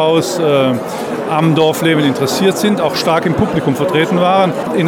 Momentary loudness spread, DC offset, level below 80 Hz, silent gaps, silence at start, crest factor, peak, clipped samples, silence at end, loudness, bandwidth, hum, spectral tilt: 4 LU; under 0.1%; -46 dBFS; none; 0 s; 10 dB; -2 dBFS; under 0.1%; 0 s; -13 LUFS; 18.5 kHz; none; -5.5 dB/octave